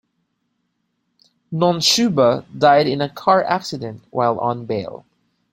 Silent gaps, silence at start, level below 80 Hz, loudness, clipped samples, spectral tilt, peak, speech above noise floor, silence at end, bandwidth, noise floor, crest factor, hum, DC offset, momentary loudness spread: none; 1.5 s; -60 dBFS; -18 LUFS; under 0.1%; -4.5 dB/octave; -2 dBFS; 54 dB; 0.55 s; 16.5 kHz; -71 dBFS; 18 dB; none; under 0.1%; 13 LU